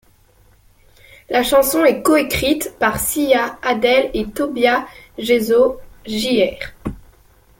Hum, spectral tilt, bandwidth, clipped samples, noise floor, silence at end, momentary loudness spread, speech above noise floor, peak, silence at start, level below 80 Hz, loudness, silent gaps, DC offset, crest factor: none; -3.5 dB/octave; 17 kHz; under 0.1%; -52 dBFS; 0.65 s; 14 LU; 36 dB; -2 dBFS; 1.3 s; -42 dBFS; -17 LUFS; none; under 0.1%; 16 dB